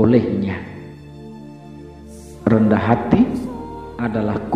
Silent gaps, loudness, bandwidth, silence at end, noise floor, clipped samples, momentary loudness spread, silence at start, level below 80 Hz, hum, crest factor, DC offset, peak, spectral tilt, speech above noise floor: none; -19 LUFS; 10.5 kHz; 0 s; -37 dBFS; under 0.1%; 23 LU; 0 s; -44 dBFS; none; 20 dB; 0.1%; 0 dBFS; -9 dB/octave; 21 dB